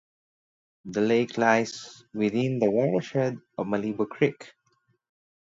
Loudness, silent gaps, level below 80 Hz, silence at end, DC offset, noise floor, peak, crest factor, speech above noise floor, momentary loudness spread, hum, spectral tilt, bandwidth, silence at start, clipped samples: -26 LUFS; none; -70 dBFS; 1.05 s; under 0.1%; -70 dBFS; -6 dBFS; 22 dB; 45 dB; 12 LU; none; -6 dB/octave; 7.8 kHz; 0.85 s; under 0.1%